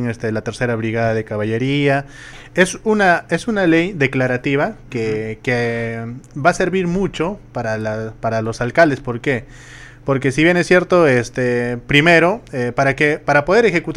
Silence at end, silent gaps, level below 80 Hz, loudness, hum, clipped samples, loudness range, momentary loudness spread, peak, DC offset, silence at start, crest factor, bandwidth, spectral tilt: 0 s; none; -42 dBFS; -17 LUFS; none; under 0.1%; 5 LU; 10 LU; 0 dBFS; under 0.1%; 0 s; 16 dB; 13 kHz; -6 dB/octave